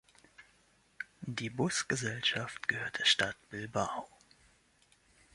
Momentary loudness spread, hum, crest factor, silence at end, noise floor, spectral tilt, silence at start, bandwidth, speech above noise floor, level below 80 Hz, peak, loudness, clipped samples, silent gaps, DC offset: 16 LU; none; 24 dB; 1.3 s; -69 dBFS; -2.5 dB/octave; 0.4 s; 11.5 kHz; 34 dB; -68 dBFS; -14 dBFS; -33 LUFS; under 0.1%; none; under 0.1%